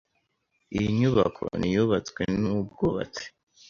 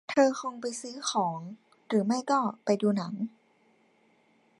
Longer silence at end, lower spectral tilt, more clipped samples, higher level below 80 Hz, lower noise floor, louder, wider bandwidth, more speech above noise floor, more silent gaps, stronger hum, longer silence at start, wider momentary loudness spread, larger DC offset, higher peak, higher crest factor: second, 0.4 s vs 1.3 s; first, -7 dB/octave vs -5 dB/octave; neither; first, -50 dBFS vs -80 dBFS; first, -75 dBFS vs -66 dBFS; first, -26 LUFS vs -29 LUFS; second, 7.4 kHz vs 11.5 kHz; first, 49 dB vs 38 dB; neither; neither; first, 0.7 s vs 0.1 s; about the same, 12 LU vs 11 LU; neither; about the same, -8 dBFS vs -10 dBFS; about the same, 18 dB vs 20 dB